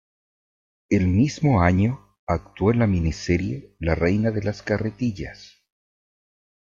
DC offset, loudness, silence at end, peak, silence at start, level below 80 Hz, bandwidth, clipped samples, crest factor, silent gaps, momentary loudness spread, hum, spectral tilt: under 0.1%; -23 LUFS; 1.15 s; -4 dBFS; 0.9 s; -42 dBFS; 7.6 kHz; under 0.1%; 18 dB; 2.19-2.27 s; 9 LU; none; -7.5 dB/octave